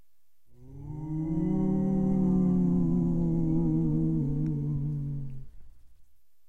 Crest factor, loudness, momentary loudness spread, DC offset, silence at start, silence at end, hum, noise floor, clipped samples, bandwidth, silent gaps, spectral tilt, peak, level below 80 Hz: 12 dB; -28 LUFS; 14 LU; 0.3%; 0.6 s; 0.8 s; none; -76 dBFS; under 0.1%; 2.2 kHz; none; -12 dB/octave; -16 dBFS; -42 dBFS